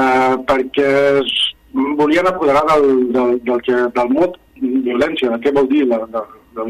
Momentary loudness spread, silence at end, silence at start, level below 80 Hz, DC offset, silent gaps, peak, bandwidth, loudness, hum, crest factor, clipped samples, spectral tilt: 7 LU; 0 s; 0 s; -46 dBFS; under 0.1%; none; -2 dBFS; 13.5 kHz; -15 LUFS; none; 12 dB; under 0.1%; -5 dB/octave